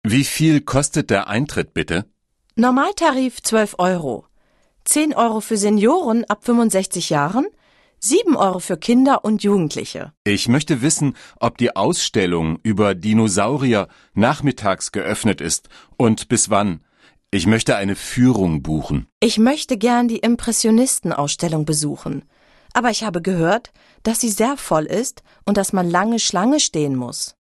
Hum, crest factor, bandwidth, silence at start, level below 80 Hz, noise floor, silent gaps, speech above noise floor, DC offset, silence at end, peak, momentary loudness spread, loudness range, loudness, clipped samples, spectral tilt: none; 16 dB; 13 kHz; 0.05 s; -44 dBFS; -59 dBFS; 10.17-10.25 s, 19.12-19.21 s; 41 dB; under 0.1%; 0.1 s; -2 dBFS; 8 LU; 2 LU; -18 LUFS; under 0.1%; -4.5 dB/octave